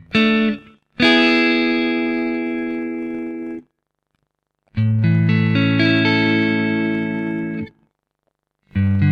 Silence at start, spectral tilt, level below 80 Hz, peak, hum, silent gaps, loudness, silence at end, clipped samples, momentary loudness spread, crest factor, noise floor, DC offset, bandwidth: 0.1 s; -7.5 dB/octave; -52 dBFS; -4 dBFS; 50 Hz at -55 dBFS; none; -18 LUFS; 0 s; under 0.1%; 15 LU; 16 dB; -74 dBFS; under 0.1%; 8.2 kHz